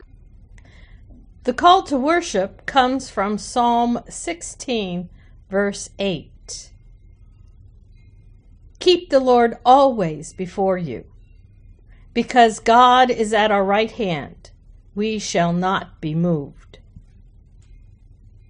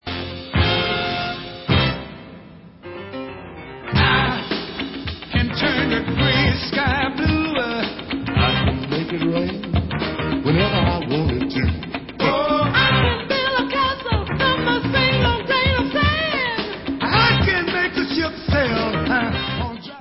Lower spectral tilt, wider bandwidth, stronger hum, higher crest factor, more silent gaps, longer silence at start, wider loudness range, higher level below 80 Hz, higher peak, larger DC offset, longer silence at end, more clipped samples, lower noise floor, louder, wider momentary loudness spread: second, -4.5 dB/octave vs -9.5 dB/octave; first, 10 kHz vs 5.8 kHz; neither; about the same, 20 dB vs 16 dB; neither; first, 0.95 s vs 0.05 s; first, 10 LU vs 5 LU; second, -46 dBFS vs -32 dBFS; first, 0 dBFS vs -4 dBFS; neither; first, 1.5 s vs 0 s; neither; first, -47 dBFS vs -41 dBFS; about the same, -19 LUFS vs -20 LUFS; first, 16 LU vs 12 LU